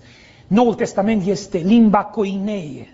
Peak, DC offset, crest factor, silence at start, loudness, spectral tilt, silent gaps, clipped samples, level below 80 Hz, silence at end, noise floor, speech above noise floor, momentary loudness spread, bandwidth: -2 dBFS; under 0.1%; 16 dB; 0.5 s; -18 LUFS; -6.5 dB/octave; none; under 0.1%; -50 dBFS; 0.1 s; -45 dBFS; 29 dB; 10 LU; 7.8 kHz